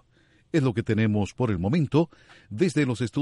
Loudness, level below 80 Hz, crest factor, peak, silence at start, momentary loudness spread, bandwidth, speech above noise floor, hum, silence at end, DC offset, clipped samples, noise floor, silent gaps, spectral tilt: -25 LUFS; -54 dBFS; 18 dB; -8 dBFS; 0.55 s; 4 LU; 11.5 kHz; 37 dB; none; 0 s; under 0.1%; under 0.1%; -61 dBFS; none; -7.5 dB/octave